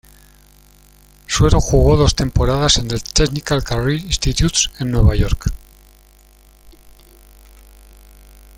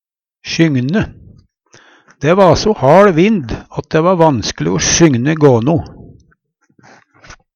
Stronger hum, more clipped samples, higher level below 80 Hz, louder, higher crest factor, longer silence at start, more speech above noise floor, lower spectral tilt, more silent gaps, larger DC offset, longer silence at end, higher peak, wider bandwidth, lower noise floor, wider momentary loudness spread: first, 50 Hz at -35 dBFS vs none; neither; first, -24 dBFS vs -38 dBFS; second, -16 LUFS vs -12 LUFS; about the same, 18 dB vs 14 dB; first, 1.3 s vs 0.45 s; second, 33 dB vs 47 dB; about the same, -4.5 dB/octave vs -5 dB/octave; neither; neither; first, 3 s vs 0.2 s; about the same, 0 dBFS vs 0 dBFS; first, 16.5 kHz vs 7.8 kHz; second, -48 dBFS vs -58 dBFS; second, 7 LU vs 13 LU